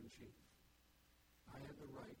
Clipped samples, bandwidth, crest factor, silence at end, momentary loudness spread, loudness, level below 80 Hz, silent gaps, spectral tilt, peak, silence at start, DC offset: under 0.1%; 17.5 kHz; 16 dB; 0 s; 7 LU; -58 LUFS; -74 dBFS; none; -5.5 dB/octave; -42 dBFS; 0 s; under 0.1%